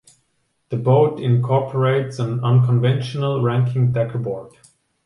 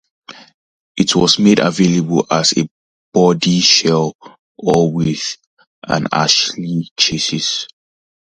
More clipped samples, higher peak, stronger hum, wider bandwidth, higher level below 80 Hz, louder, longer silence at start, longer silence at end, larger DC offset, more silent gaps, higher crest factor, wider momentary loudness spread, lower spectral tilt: neither; second, -4 dBFS vs 0 dBFS; neither; about the same, 10.5 kHz vs 10 kHz; second, -58 dBFS vs -50 dBFS; second, -19 LUFS vs -14 LUFS; first, 0.7 s vs 0.3 s; about the same, 0.6 s vs 0.6 s; neither; second, none vs 0.54-0.95 s, 2.71-3.12 s, 4.15-4.19 s, 4.39-4.55 s, 5.47-5.57 s, 5.67-5.82 s, 6.91-6.96 s; about the same, 14 dB vs 16 dB; second, 8 LU vs 12 LU; first, -8.5 dB/octave vs -4 dB/octave